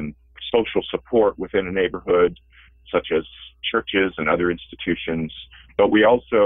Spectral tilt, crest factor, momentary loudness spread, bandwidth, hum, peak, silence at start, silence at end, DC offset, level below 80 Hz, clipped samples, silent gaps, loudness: -9.5 dB/octave; 16 dB; 13 LU; 3.9 kHz; none; -6 dBFS; 0 s; 0 s; under 0.1%; -48 dBFS; under 0.1%; none; -21 LUFS